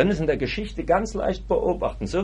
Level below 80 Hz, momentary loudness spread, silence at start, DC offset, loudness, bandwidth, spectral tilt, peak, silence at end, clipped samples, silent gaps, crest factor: -36 dBFS; 5 LU; 0 s; under 0.1%; -24 LUFS; 10.5 kHz; -6.5 dB/octave; -6 dBFS; 0 s; under 0.1%; none; 18 dB